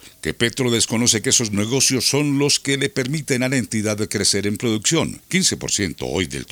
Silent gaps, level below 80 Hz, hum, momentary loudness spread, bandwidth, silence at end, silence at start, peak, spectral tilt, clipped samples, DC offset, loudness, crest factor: none; -50 dBFS; none; 6 LU; over 20 kHz; 0.05 s; 0.05 s; -2 dBFS; -3 dB/octave; under 0.1%; under 0.1%; -19 LUFS; 18 dB